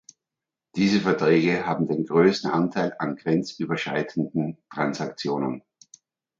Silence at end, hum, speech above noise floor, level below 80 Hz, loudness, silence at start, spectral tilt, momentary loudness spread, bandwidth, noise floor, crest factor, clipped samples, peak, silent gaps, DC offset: 0.8 s; none; 64 dB; -64 dBFS; -24 LUFS; 0.75 s; -6.5 dB/octave; 9 LU; 7.6 kHz; -88 dBFS; 18 dB; under 0.1%; -6 dBFS; none; under 0.1%